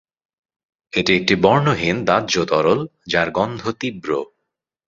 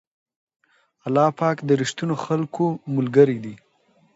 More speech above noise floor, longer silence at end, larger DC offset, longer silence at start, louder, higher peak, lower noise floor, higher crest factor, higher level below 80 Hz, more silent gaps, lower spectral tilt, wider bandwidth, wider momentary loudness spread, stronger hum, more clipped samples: first, 60 dB vs 41 dB; about the same, 0.65 s vs 0.6 s; neither; about the same, 0.95 s vs 1.05 s; first, -18 LUFS vs -21 LUFS; about the same, -2 dBFS vs -2 dBFS; first, -78 dBFS vs -61 dBFS; about the same, 18 dB vs 20 dB; first, -50 dBFS vs -68 dBFS; neither; second, -5 dB/octave vs -6.5 dB/octave; about the same, 7.8 kHz vs 8 kHz; about the same, 10 LU vs 11 LU; neither; neither